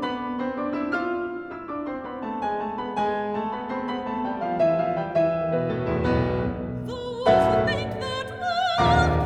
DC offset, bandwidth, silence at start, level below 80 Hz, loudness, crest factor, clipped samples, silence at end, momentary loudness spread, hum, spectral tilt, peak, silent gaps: under 0.1%; 10 kHz; 0 s; -40 dBFS; -25 LUFS; 18 dB; under 0.1%; 0 s; 12 LU; none; -7 dB/octave; -6 dBFS; none